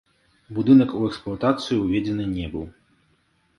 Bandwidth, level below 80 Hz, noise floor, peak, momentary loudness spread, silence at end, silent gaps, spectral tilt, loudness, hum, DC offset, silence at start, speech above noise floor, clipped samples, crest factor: 11 kHz; -48 dBFS; -65 dBFS; -4 dBFS; 16 LU; 0.9 s; none; -7.5 dB/octave; -22 LUFS; none; under 0.1%; 0.5 s; 44 dB; under 0.1%; 20 dB